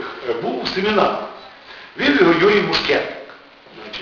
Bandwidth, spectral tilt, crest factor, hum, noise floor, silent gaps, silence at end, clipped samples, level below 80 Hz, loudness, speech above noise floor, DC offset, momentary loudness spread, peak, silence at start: 7.2 kHz; -2.5 dB/octave; 18 dB; none; -42 dBFS; none; 0 s; under 0.1%; -52 dBFS; -17 LUFS; 25 dB; under 0.1%; 23 LU; 0 dBFS; 0 s